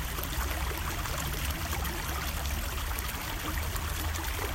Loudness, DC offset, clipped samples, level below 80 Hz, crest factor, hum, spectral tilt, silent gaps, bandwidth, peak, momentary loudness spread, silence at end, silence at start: -33 LUFS; under 0.1%; under 0.1%; -36 dBFS; 20 dB; none; -3.5 dB/octave; none; 16.5 kHz; -14 dBFS; 1 LU; 0 s; 0 s